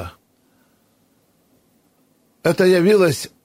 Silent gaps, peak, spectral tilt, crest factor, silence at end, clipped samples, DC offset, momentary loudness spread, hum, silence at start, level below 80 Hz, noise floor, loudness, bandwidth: none; -4 dBFS; -5.5 dB/octave; 16 dB; 0.2 s; under 0.1%; under 0.1%; 10 LU; none; 0 s; -56 dBFS; -61 dBFS; -16 LUFS; 16 kHz